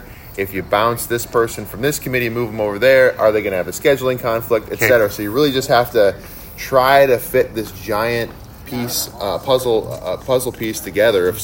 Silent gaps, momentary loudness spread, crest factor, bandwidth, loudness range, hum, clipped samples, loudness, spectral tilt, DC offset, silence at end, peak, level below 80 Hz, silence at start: none; 12 LU; 16 dB; 16.5 kHz; 5 LU; none; under 0.1%; -17 LUFS; -4.5 dB/octave; under 0.1%; 0 s; 0 dBFS; -42 dBFS; 0 s